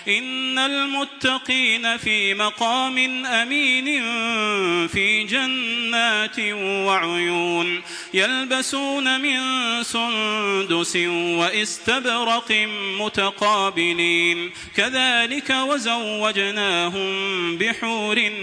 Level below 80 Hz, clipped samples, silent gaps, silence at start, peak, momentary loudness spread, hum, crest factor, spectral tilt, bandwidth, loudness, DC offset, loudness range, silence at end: -60 dBFS; under 0.1%; none; 0 s; -4 dBFS; 4 LU; none; 18 dB; -2 dB/octave; 10.5 kHz; -20 LUFS; under 0.1%; 2 LU; 0 s